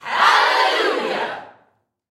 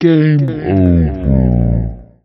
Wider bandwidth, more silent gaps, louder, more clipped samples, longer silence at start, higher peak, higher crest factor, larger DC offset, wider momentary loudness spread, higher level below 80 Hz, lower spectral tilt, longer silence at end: first, 16 kHz vs 5.8 kHz; neither; second, -17 LUFS vs -13 LUFS; neither; about the same, 0.05 s vs 0 s; about the same, -2 dBFS vs 0 dBFS; first, 18 dB vs 12 dB; neither; first, 13 LU vs 6 LU; second, -78 dBFS vs -22 dBFS; second, -1 dB/octave vs -11 dB/octave; first, 0.6 s vs 0.2 s